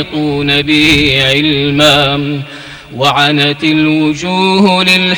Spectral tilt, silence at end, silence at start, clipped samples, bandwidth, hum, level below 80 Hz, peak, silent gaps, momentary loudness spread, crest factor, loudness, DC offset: -4.5 dB/octave; 0 s; 0 s; 0.4%; 19.5 kHz; none; -36 dBFS; 0 dBFS; none; 9 LU; 10 dB; -9 LUFS; under 0.1%